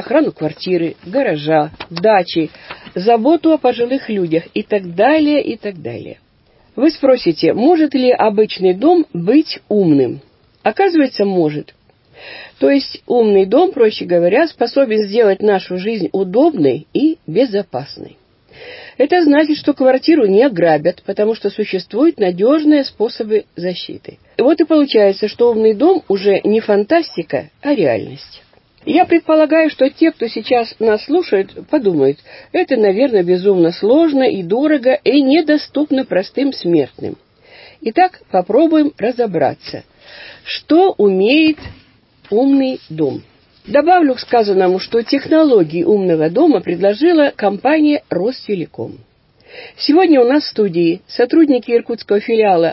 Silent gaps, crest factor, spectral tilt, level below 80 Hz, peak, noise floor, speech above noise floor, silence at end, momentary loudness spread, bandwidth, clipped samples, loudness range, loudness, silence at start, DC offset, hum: none; 14 dB; -10 dB/octave; -56 dBFS; 0 dBFS; -52 dBFS; 39 dB; 0 s; 11 LU; 5.8 kHz; under 0.1%; 3 LU; -14 LUFS; 0 s; under 0.1%; none